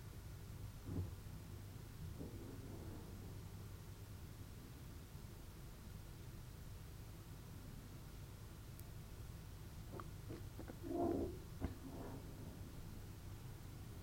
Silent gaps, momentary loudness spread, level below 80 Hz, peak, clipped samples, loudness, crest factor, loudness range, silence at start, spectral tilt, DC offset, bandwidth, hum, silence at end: none; 8 LU; -58 dBFS; -30 dBFS; under 0.1%; -52 LUFS; 22 dB; 7 LU; 0 s; -6.5 dB/octave; under 0.1%; 16 kHz; none; 0 s